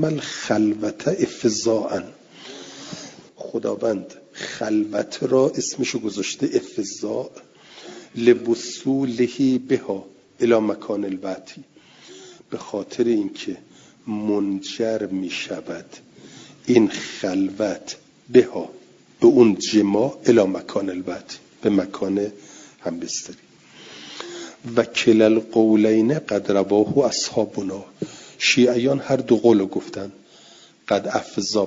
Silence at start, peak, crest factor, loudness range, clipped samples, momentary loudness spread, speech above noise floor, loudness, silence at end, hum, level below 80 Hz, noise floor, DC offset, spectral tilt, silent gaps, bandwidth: 0 s; -2 dBFS; 20 dB; 8 LU; under 0.1%; 19 LU; 29 dB; -21 LUFS; 0 s; none; -64 dBFS; -49 dBFS; under 0.1%; -5 dB/octave; none; 7.8 kHz